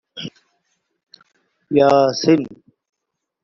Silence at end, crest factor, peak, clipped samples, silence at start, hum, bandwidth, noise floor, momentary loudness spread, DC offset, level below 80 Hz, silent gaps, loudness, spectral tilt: 0.9 s; 18 dB; -2 dBFS; under 0.1%; 0.15 s; none; 7.4 kHz; -79 dBFS; 20 LU; under 0.1%; -60 dBFS; none; -16 LUFS; -5 dB/octave